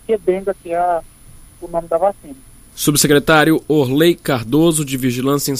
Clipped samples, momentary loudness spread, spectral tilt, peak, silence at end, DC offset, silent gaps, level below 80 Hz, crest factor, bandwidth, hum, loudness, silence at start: under 0.1%; 10 LU; -4.5 dB/octave; 0 dBFS; 0 s; under 0.1%; none; -42 dBFS; 16 dB; 15.5 kHz; none; -16 LUFS; 0.1 s